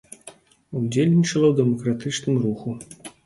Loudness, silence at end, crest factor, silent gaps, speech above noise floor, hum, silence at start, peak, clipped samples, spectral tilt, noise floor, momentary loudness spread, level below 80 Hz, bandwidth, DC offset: -21 LUFS; 0.15 s; 16 dB; none; 27 dB; none; 0.25 s; -6 dBFS; under 0.1%; -6.5 dB/octave; -48 dBFS; 19 LU; -60 dBFS; 11.5 kHz; under 0.1%